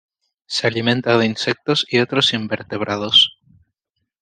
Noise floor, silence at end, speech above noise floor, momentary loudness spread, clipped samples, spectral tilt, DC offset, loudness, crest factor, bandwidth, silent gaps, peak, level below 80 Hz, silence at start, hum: -76 dBFS; 0.9 s; 58 dB; 11 LU; under 0.1%; -4 dB/octave; under 0.1%; -17 LUFS; 18 dB; 9.8 kHz; none; -2 dBFS; -62 dBFS; 0.5 s; none